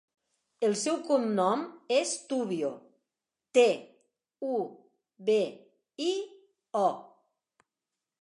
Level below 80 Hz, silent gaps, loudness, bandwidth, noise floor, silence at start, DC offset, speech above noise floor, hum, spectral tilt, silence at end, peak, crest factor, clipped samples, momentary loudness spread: -88 dBFS; none; -30 LUFS; 11.5 kHz; -89 dBFS; 0.6 s; under 0.1%; 61 dB; none; -4 dB/octave; 1.15 s; -10 dBFS; 22 dB; under 0.1%; 11 LU